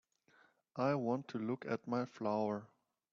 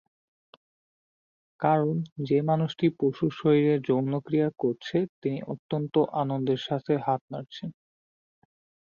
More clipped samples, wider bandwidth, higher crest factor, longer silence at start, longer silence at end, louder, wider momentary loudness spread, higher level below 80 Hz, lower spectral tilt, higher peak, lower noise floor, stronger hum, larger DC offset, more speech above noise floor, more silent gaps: neither; about the same, 7.2 kHz vs 7 kHz; about the same, 18 dB vs 18 dB; second, 0.75 s vs 1.6 s; second, 0.45 s vs 1.2 s; second, -39 LUFS vs -27 LUFS; second, 5 LU vs 9 LU; second, -82 dBFS vs -70 dBFS; second, -6.5 dB/octave vs -8.5 dB/octave; second, -22 dBFS vs -10 dBFS; second, -71 dBFS vs under -90 dBFS; neither; neither; second, 33 dB vs over 64 dB; second, none vs 2.12-2.16 s, 5.09-5.22 s, 5.59-5.69 s, 7.21-7.28 s